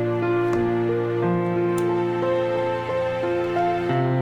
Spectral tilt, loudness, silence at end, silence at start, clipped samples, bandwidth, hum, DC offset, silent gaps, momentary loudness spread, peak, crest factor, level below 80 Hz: -8 dB/octave; -23 LUFS; 0 s; 0 s; under 0.1%; 10.5 kHz; none; under 0.1%; none; 2 LU; -10 dBFS; 12 dB; -52 dBFS